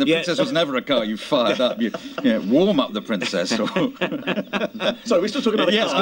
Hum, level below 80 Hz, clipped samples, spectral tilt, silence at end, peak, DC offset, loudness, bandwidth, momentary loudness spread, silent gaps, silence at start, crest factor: none; -62 dBFS; under 0.1%; -4.5 dB/octave; 0 s; -4 dBFS; under 0.1%; -21 LUFS; 16.5 kHz; 6 LU; none; 0 s; 18 dB